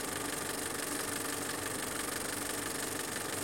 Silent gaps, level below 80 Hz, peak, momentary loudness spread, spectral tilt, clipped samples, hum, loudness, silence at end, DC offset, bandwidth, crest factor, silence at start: none; -62 dBFS; -22 dBFS; 1 LU; -2 dB/octave; under 0.1%; none; -35 LUFS; 0 s; under 0.1%; 17 kHz; 14 dB; 0 s